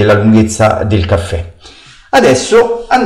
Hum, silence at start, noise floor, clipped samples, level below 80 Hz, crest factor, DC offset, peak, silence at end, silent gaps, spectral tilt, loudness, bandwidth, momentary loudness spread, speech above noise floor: none; 0 s; -37 dBFS; under 0.1%; -30 dBFS; 8 dB; under 0.1%; -2 dBFS; 0 s; none; -5.5 dB/octave; -10 LUFS; 14 kHz; 11 LU; 28 dB